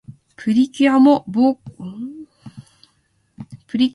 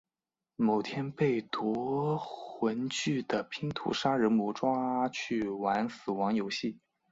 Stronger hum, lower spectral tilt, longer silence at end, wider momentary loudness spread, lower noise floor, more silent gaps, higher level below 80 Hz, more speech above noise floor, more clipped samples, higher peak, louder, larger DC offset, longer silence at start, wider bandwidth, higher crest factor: neither; about the same, -6.5 dB/octave vs -5.5 dB/octave; second, 0.05 s vs 0.35 s; first, 26 LU vs 7 LU; second, -63 dBFS vs under -90 dBFS; neither; first, -60 dBFS vs -70 dBFS; second, 48 dB vs over 59 dB; neither; first, -2 dBFS vs -14 dBFS; first, -16 LUFS vs -32 LUFS; neither; second, 0.1 s vs 0.6 s; first, 11.5 kHz vs 7.8 kHz; about the same, 18 dB vs 18 dB